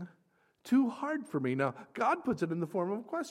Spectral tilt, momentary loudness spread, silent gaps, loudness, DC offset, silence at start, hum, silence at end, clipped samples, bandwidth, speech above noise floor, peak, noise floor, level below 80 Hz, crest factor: -7 dB/octave; 6 LU; none; -33 LUFS; under 0.1%; 0 s; none; 0 s; under 0.1%; 13.5 kHz; 39 dB; -16 dBFS; -72 dBFS; -74 dBFS; 18 dB